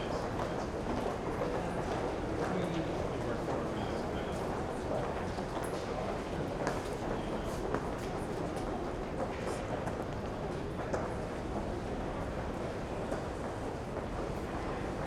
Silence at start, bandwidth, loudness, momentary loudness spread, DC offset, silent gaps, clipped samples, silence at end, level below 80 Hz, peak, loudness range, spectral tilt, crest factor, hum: 0 s; 16.5 kHz; -37 LUFS; 3 LU; under 0.1%; none; under 0.1%; 0 s; -48 dBFS; -14 dBFS; 2 LU; -6.5 dB/octave; 22 dB; none